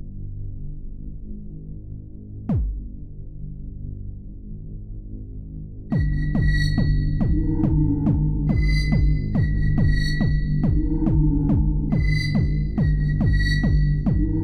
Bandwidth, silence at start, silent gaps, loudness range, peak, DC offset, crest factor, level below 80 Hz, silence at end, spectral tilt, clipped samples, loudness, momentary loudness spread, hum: 9.4 kHz; 0 s; none; 11 LU; -8 dBFS; under 0.1%; 14 dB; -24 dBFS; 0 s; -8 dB/octave; under 0.1%; -22 LUFS; 18 LU; none